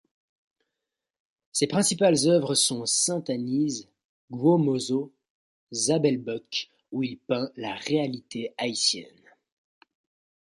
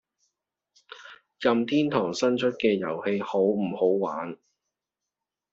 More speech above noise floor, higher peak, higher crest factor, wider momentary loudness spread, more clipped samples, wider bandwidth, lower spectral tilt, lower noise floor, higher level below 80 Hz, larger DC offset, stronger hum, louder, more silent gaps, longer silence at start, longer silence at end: about the same, 61 dB vs 63 dB; about the same, -8 dBFS vs -8 dBFS; about the same, 18 dB vs 20 dB; second, 12 LU vs 17 LU; neither; first, 12 kHz vs 7.8 kHz; about the same, -4 dB/octave vs -4.5 dB/octave; about the same, -87 dBFS vs -87 dBFS; about the same, -72 dBFS vs -70 dBFS; neither; neither; about the same, -25 LUFS vs -26 LUFS; first, 4.05-4.28 s, 5.30-5.67 s vs none; first, 1.55 s vs 0.9 s; first, 1.5 s vs 1.15 s